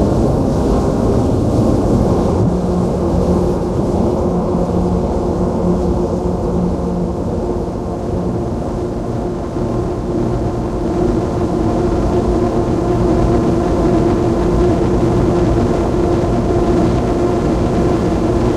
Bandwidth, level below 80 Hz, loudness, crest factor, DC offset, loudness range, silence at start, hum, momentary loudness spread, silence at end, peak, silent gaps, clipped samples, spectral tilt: 12 kHz; -24 dBFS; -16 LUFS; 14 dB; under 0.1%; 5 LU; 0 s; none; 5 LU; 0 s; 0 dBFS; none; under 0.1%; -8.5 dB/octave